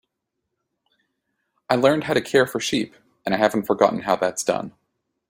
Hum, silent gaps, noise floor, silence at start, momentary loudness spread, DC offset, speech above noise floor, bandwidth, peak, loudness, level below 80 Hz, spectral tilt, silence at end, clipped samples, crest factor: none; none; -80 dBFS; 1.7 s; 9 LU; under 0.1%; 59 dB; 16.5 kHz; -2 dBFS; -21 LUFS; -62 dBFS; -4 dB/octave; 0.6 s; under 0.1%; 22 dB